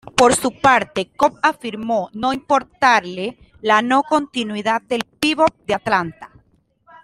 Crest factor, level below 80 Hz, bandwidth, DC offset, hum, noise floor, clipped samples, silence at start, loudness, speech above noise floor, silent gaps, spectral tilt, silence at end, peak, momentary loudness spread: 18 dB; -52 dBFS; 15.5 kHz; under 0.1%; none; -59 dBFS; under 0.1%; 0.05 s; -18 LUFS; 41 dB; none; -3.5 dB/octave; 0.8 s; -2 dBFS; 10 LU